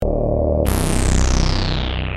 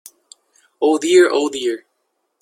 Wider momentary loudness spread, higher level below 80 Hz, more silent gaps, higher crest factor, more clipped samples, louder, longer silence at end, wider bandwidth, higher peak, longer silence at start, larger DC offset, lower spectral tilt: second, 3 LU vs 11 LU; first, -20 dBFS vs -66 dBFS; neither; about the same, 16 dB vs 18 dB; neither; second, -19 LUFS vs -16 LUFS; second, 0 s vs 0.65 s; about the same, 15 kHz vs 14 kHz; about the same, -2 dBFS vs -2 dBFS; second, 0 s vs 0.8 s; neither; first, -5 dB/octave vs -2.5 dB/octave